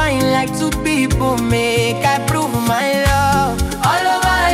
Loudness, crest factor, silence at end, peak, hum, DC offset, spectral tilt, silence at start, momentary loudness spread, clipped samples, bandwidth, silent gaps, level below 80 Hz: -16 LUFS; 14 dB; 0 s; -2 dBFS; none; under 0.1%; -4.5 dB/octave; 0 s; 3 LU; under 0.1%; 16.5 kHz; none; -28 dBFS